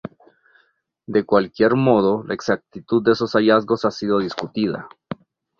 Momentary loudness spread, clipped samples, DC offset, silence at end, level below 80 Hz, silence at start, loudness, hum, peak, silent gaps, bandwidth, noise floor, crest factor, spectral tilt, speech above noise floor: 17 LU; under 0.1%; under 0.1%; 0.45 s; -58 dBFS; 0.05 s; -19 LUFS; none; -2 dBFS; none; 7.2 kHz; -64 dBFS; 18 dB; -7 dB/octave; 45 dB